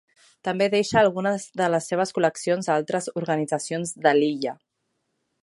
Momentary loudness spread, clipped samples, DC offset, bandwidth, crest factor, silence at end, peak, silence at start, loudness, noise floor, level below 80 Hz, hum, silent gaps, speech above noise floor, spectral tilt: 9 LU; under 0.1%; under 0.1%; 11.5 kHz; 20 dB; 0.9 s; -4 dBFS; 0.45 s; -24 LUFS; -76 dBFS; -66 dBFS; none; none; 53 dB; -4.5 dB/octave